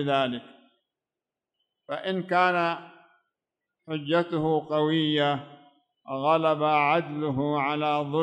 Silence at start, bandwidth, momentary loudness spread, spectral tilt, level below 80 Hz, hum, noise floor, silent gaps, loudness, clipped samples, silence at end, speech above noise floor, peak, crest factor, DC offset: 0 s; 9.2 kHz; 11 LU; -7 dB/octave; -68 dBFS; none; -89 dBFS; none; -26 LUFS; under 0.1%; 0 s; 64 dB; -8 dBFS; 18 dB; under 0.1%